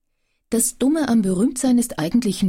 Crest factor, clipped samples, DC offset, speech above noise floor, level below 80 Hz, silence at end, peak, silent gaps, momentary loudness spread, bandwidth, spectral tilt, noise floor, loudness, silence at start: 12 dB; under 0.1%; under 0.1%; 51 dB; -48 dBFS; 0 s; -6 dBFS; none; 3 LU; 16.5 kHz; -5 dB/octave; -70 dBFS; -19 LUFS; 0.5 s